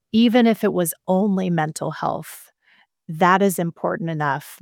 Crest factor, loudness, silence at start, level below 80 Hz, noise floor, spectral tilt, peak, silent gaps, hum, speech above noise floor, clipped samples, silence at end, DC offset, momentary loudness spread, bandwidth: 18 dB; -20 LUFS; 0.15 s; -68 dBFS; -59 dBFS; -5.5 dB/octave; -2 dBFS; none; none; 40 dB; under 0.1%; 0.05 s; under 0.1%; 10 LU; 18 kHz